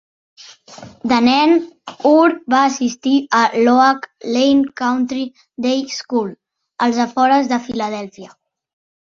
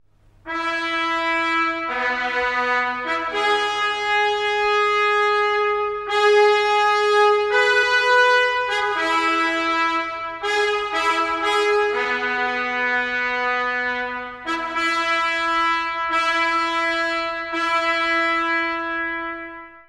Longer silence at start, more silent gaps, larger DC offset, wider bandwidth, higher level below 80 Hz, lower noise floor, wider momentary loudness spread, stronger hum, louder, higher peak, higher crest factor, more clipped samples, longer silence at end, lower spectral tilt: first, 0.7 s vs 0.45 s; neither; neither; second, 7.6 kHz vs 12 kHz; about the same, -60 dBFS vs -56 dBFS; about the same, -39 dBFS vs -42 dBFS; first, 12 LU vs 8 LU; neither; first, -16 LUFS vs -19 LUFS; about the same, -2 dBFS vs -4 dBFS; about the same, 16 dB vs 16 dB; neither; first, 0.75 s vs 0.1 s; first, -4 dB/octave vs -2 dB/octave